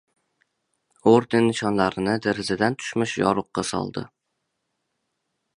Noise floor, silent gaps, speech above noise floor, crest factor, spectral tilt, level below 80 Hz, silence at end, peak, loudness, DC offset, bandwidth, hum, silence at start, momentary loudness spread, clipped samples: -78 dBFS; none; 56 dB; 22 dB; -5.5 dB/octave; -58 dBFS; 1.5 s; -4 dBFS; -23 LUFS; under 0.1%; 11 kHz; none; 1.05 s; 10 LU; under 0.1%